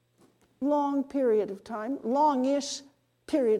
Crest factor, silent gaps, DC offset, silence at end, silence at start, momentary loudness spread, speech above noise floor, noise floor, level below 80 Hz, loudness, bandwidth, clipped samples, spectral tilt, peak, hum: 14 dB; none; under 0.1%; 0 s; 0.6 s; 11 LU; 37 dB; -64 dBFS; -72 dBFS; -28 LUFS; 11.5 kHz; under 0.1%; -4.5 dB/octave; -14 dBFS; none